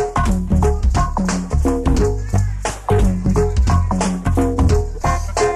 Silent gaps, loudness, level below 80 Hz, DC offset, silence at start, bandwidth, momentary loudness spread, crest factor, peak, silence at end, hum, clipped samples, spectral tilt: none; -18 LUFS; -20 dBFS; under 0.1%; 0 s; 13.5 kHz; 4 LU; 10 dB; -6 dBFS; 0 s; none; under 0.1%; -6.5 dB/octave